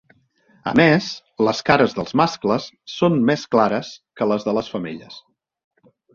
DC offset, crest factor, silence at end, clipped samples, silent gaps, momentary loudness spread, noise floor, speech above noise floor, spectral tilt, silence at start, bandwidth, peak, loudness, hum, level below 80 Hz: under 0.1%; 20 dB; 0.95 s; under 0.1%; none; 15 LU; -58 dBFS; 39 dB; -6 dB/octave; 0.65 s; 7.4 kHz; -2 dBFS; -19 LUFS; none; -56 dBFS